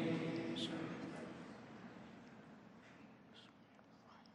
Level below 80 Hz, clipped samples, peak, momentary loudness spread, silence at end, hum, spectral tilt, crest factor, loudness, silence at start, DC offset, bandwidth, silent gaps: -82 dBFS; under 0.1%; -28 dBFS; 20 LU; 0 s; none; -6 dB/octave; 20 dB; -47 LUFS; 0 s; under 0.1%; 10 kHz; none